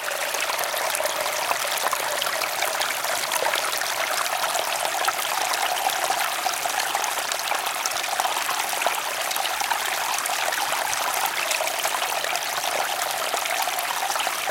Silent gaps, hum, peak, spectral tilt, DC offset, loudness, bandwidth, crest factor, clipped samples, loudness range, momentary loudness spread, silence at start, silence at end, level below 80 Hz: none; none; -2 dBFS; 1 dB/octave; under 0.1%; -23 LUFS; 17 kHz; 22 dB; under 0.1%; 1 LU; 2 LU; 0 s; 0 s; -70 dBFS